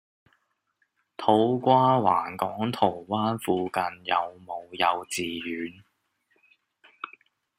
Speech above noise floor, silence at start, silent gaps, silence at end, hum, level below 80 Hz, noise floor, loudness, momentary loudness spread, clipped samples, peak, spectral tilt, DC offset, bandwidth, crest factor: 49 dB; 1.2 s; none; 0.55 s; none; -70 dBFS; -74 dBFS; -26 LUFS; 18 LU; under 0.1%; -6 dBFS; -5.5 dB/octave; under 0.1%; 15.5 kHz; 22 dB